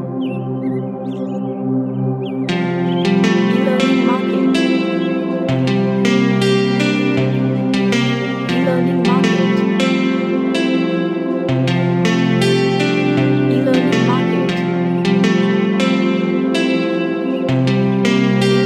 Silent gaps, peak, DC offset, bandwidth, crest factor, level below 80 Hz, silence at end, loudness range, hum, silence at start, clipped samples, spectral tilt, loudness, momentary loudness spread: none; -2 dBFS; under 0.1%; 11.5 kHz; 14 dB; -54 dBFS; 0 s; 1 LU; none; 0 s; under 0.1%; -6.5 dB/octave; -16 LUFS; 6 LU